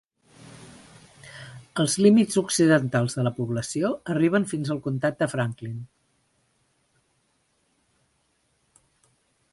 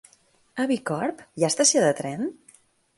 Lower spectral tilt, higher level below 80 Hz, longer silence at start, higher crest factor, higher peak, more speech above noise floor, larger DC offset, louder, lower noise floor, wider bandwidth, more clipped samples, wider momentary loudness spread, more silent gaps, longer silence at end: first, -5.5 dB/octave vs -3 dB/octave; first, -64 dBFS vs -70 dBFS; about the same, 0.45 s vs 0.55 s; about the same, 20 dB vs 18 dB; about the same, -6 dBFS vs -8 dBFS; first, 47 dB vs 37 dB; neither; about the same, -24 LUFS vs -24 LUFS; first, -70 dBFS vs -61 dBFS; about the same, 12 kHz vs 11.5 kHz; neither; first, 24 LU vs 13 LU; neither; first, 3.65 s vs 0.65 s